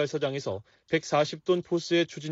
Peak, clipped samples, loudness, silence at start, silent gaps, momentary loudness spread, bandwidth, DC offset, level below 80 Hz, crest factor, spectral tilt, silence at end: -12 dBFS; under 0.1%; -28 LUFS; 0 s; none; 8 LU; 8 kHz; under 0.1%; -70 dBFS; 16 dB; -4 dB/octave; 0 s